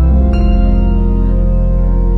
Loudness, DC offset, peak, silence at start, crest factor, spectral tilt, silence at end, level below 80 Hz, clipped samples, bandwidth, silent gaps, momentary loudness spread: -14 LUFS; under 0.1%; -2 dBFS; 0 s; 8 dB; -10.5 dB/octave; 0 s; -10 dBFS; under 0.1%; 4.4 kHz; none; 3 LU